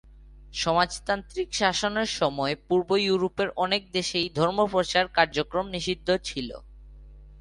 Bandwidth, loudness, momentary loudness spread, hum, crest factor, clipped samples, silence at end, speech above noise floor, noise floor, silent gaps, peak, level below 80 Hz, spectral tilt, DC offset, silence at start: 11.5 kHz; -26 LUFS; 6 LU; none; 22 dB; under 0.1%; 0 s; 22 dB; -48 dBFS; none; -6 dBFS; -50 dBFS; -4 dB/octave; under 0.1%; 0.1 s